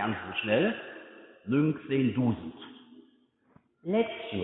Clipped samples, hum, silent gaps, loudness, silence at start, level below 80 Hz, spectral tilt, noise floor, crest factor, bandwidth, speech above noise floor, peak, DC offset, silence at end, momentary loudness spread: under 0.1%; none; none; -29 LUFS; 0 s; -66 dBFS; -10.5 dB/octave; -66 dBFS; 18 dB; 4 kHz; 37 dB; -12 dBFS; under 0.1%; 0 s; 20 LU